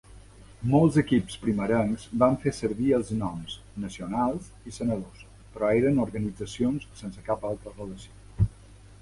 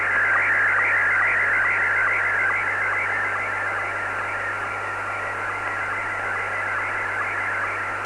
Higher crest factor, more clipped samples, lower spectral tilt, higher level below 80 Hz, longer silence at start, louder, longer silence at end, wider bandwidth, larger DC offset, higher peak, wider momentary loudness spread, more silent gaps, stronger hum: first, 20 dB vs 12 dB; neither; first, -7 dB/octave vs -3.5 dB/octave; first, -46 dBFS vs -56 dBFS; about the same, 0.1 s vs 0 s; second, -27 LUFS vs -21 LUFS; about the same, 0.1 s vs 0 s; about the same, 11.5 kHz vs 11 kHz; neither; about the same, -8 dBFS vs -10 dBFS; first, 17 LU vs 8 LU; neither; neither